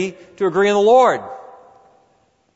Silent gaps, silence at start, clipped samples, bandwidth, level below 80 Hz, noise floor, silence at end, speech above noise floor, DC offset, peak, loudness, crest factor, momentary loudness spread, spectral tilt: none; 0 s; under 0.1%; 8 kHz; -66 dBFS; -60 dBFS; 1.15 s; 44 dB; under 0.1%; -4 dBFS; -16 LUFS; 16 dB; 20 LU; -5 dB/octave